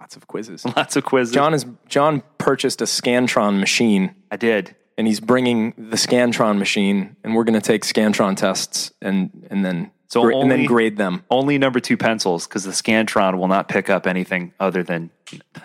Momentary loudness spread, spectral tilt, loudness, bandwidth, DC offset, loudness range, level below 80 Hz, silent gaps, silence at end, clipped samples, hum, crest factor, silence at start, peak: 7 LU; -4.5 dB/octave; -19 LUFS; 16 kHz; under 0.1%; 2 LU; -64 dBFS; none; 0.05 s; under 0.1%; none; 16 dB; 0 s; -2 dBFS